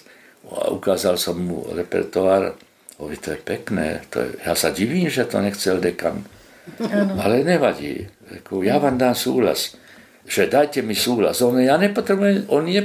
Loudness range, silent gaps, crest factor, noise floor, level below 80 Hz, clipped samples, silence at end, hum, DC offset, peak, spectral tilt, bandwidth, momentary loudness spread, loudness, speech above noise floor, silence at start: 4 LU; none; 18 dB; -47 dBFS; -50 dBFS; under 0.1%; 0 s; none; under 0.1%; -2 dBFS; -4.5 dB/octave; 16 kHz; 12 LU; -20 LUFS; 27 dB; 0.45 s